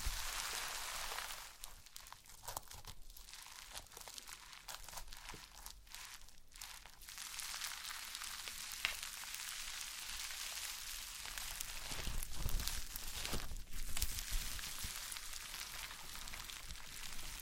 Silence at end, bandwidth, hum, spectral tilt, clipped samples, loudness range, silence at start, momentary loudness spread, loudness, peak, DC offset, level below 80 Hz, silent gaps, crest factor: 0 s; 17 kHz; none; -0.5 dB/octave; under 0.1%; 8 LU; 0 s; 12 LU; -45 LUFS; -14 dBFS; under 0.1%; -50 dBFS; none; 32 dB